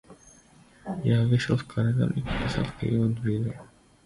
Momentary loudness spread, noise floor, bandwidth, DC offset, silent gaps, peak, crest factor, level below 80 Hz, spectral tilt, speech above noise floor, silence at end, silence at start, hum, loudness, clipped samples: 11 LU; -55 dBFS; 11.5 kHz; under 0.1%; none; -10 dBFS; 16 dB; -46 dBFS; -7.5 dB/octave; 30 dB; 0.4 s; 0.1 s; none; -27 LUFS; under 0.1%